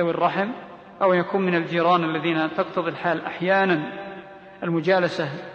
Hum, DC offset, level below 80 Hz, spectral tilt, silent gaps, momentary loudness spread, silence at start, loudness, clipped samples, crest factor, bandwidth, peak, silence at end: none; under 0.1%; -68 dBFS; -7 dB/octave; none; 13 LU; 0 s; -23 LUFS; under 0.1%; 16 dB; 8 kHz; -6 dBFS; 0 s